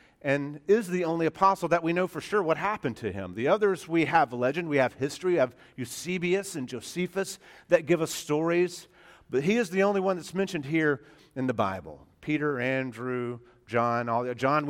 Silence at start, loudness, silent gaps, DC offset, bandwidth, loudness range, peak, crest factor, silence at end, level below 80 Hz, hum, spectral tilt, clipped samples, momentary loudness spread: 0.25 s; -28 LUFS; none; under 0.1%; 16.5 kHz; 3 LU; -8 dBFS; 20 dB; 0 s; -64 dBFS; none; -5.5 dB/octave; under 0.1%; 11 LU